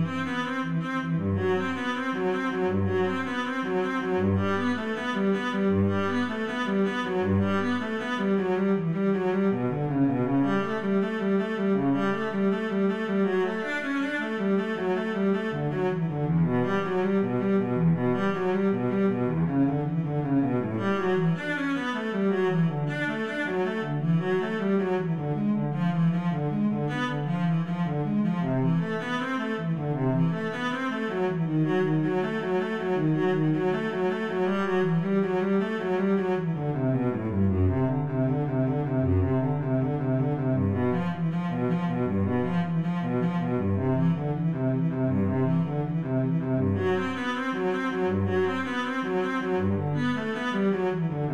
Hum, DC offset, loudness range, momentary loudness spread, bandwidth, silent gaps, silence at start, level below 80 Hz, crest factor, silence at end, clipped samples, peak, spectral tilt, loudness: none; 0.3%; 1 LU; 4 LU; 8.4 kHz; none; 0 s; -62 dBFS; 12 dB; 0 s; under 0.1%; -12 dBFS; -8 dB/octave; -27 LUFS